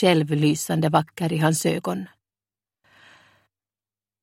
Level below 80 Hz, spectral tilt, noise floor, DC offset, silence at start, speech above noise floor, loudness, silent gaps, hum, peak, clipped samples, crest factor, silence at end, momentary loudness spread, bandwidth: -64 dBFS; -5.5 dB/octave; under -90 dBFS; under 0.1%; 0 s; over 69 dB; -22 LUFS; none; none; -2 dBFS; under 0.1%; 22 dB; 2.15 s; 10 LU; 16.5 kHz